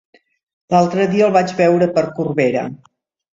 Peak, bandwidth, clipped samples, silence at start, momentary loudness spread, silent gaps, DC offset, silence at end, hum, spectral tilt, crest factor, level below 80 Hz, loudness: -2 dBFS; 7.8 kHz; under 0.1%; 0.7 s; 6 LU; none; under 0.1%; 0.6 s; none; -7 dB/octave; 16 dB; -60 dBFS; -16 LUFS